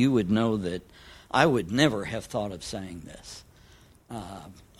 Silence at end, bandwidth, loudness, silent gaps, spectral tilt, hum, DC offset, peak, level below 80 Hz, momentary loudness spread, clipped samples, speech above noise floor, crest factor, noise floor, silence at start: 0.2 s; 15 kHz; -27 LUFS; none; -5.5 dB/octave; none; under 0.1%; -4 dBFS; -54 dBFS; 20 LU; under 0.1%; 28 dB; 24 dB; -55 dBFS; 0 s